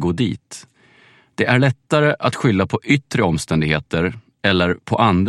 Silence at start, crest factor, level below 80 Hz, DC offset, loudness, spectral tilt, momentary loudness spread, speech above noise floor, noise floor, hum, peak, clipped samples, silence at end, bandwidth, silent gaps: 0 s; 18 dB; -44 dBFS; under 0.1%; -18 LUFS; -6 dB/octave; 8 LU; 34 dB; -52 dBFS; none; 0 dBFS; under 0.1%; 0 s; 12.5 kHz; none